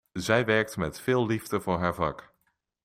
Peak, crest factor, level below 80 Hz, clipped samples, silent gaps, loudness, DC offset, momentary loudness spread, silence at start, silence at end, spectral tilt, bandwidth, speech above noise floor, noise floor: -10 dBFS; 20 dB; -56 dBFS; under 0.1%; none; -27 LUFS; under 0.1%; 8 LU; 0.15 s; 0.6 s; -5.5 dB/octave; 16 kHz; 48 dB; -75 dBFS